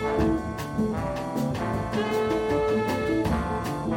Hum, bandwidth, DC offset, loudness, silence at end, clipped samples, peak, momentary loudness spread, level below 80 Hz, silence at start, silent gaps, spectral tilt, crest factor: none; 17 kHz; under 0.1%; -27 LUFS; 0 s; under 0.1%; -12 dBFS; 5 LU; -40 dBFS; 0 s; none; -6.5 dB/octave; 14 dB